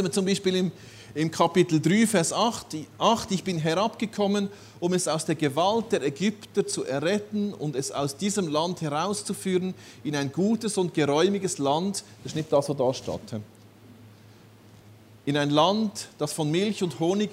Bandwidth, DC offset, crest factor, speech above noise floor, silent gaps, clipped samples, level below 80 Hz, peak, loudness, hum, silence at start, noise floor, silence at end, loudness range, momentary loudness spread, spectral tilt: 16 kHz; under 0.1%; 20 dB; 26 dB; none; under 0.1%; -66 dBFS; -6 dBFS; -26 LUFS; none; 0 s; -51 dBFS; 0 s; 5 LU; 11 LU; -5 dB/octave